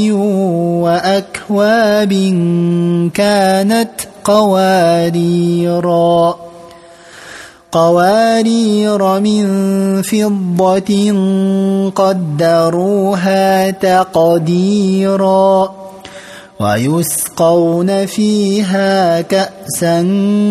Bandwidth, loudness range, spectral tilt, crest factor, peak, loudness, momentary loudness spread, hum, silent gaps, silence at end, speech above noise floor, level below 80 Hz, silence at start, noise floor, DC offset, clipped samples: 15 kHz; 2 LU; -6 dB/octave; 12 dB; 0 dBFS; -12 LUFS; 6 LU; none; none; 0 s; 25 dB; -52 dBFS; 0 s; -37 dBFS; under 0.1%; under 0.1%